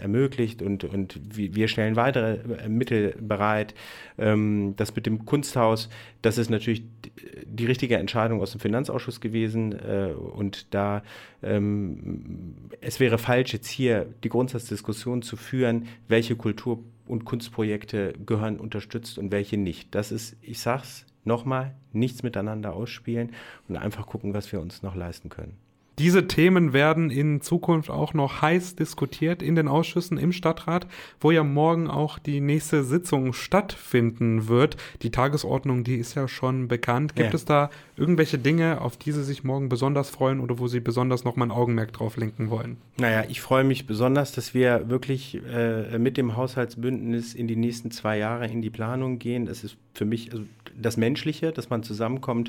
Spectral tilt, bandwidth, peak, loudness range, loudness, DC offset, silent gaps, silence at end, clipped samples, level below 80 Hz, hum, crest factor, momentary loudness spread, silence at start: -6.5 dB/octave; 18.5 kHz; -6 dBFS; 6 LU; -26 LUFS; under 0.1%; none; 0 s; under 0.1%; -54 dBFS; none; 18 dB; 12 LU; 0 s